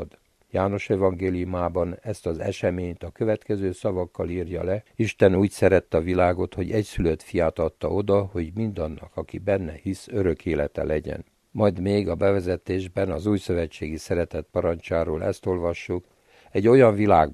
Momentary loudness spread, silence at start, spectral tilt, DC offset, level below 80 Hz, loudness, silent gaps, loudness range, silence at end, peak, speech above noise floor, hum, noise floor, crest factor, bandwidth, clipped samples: 11 LU; 0 s; -7.5 dB/octave; under 0.1%; -44 dBFS; -24 LUFS; none; 5 LU; 0 s; -4 dBFS; 26 dB; none; -50 dBFS; 20 dB; 13 kHz; under 0.1%